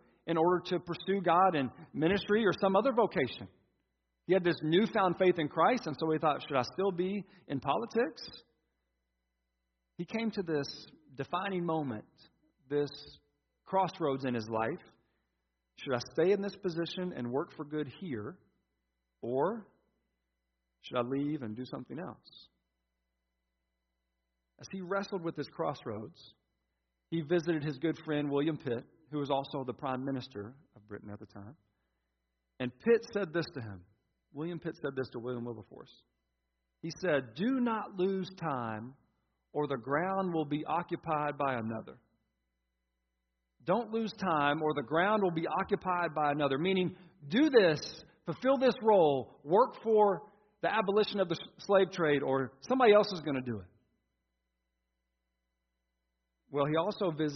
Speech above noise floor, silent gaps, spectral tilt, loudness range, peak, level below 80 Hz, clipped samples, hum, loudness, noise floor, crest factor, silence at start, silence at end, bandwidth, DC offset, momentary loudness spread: 52 dB; none; -4.5 dB/octave; 11 LU; -12 dBFS; -72 dBFS; under 0.1%; none; -32 LUFS; -84 dBFS; 22 dB; 0.25 s; 0 s; 6.2 kHz; under 0.1%; 16 LU